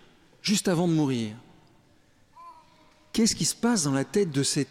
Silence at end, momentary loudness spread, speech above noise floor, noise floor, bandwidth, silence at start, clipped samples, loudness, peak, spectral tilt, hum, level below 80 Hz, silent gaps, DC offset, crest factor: 0.05 s; 9 LU; 35 dB; -60 dBFS; 16 kHz; 0.45 s; under 0.1%; -26 LUFS; -14 dBFS; -4 dB/octave; none; -60 dBFS; none; under 0.1%; 14 dB